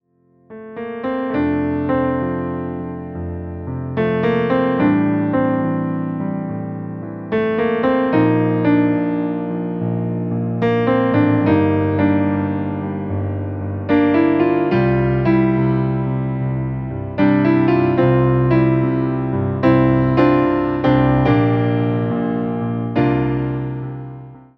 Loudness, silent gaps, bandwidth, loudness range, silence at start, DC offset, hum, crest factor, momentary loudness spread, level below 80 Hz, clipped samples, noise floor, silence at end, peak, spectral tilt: -18 LUFS; none; 5.4 kHz; 4 LU; 0.5 s; under 0.1%; none; 16 dB; 11 LU; -40 dBFS; under 0.1%; -56 dBFS; 0.2 s; -2 dBFS; -10.5 dB/octave